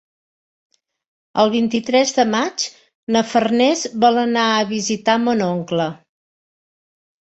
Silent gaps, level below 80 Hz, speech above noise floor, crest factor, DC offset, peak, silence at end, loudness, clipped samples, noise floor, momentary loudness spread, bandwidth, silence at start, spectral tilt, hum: 2.95-3.07 s; -62 dBFS; over 73 dB; 18 dB; under 0.1%; -2 dBFS; 1.4 s; -18 LUFS; under 0.1%; under -90 dBFS; 7 LU; 8.2 kHz; 1.35 s; -4 dB/octave; none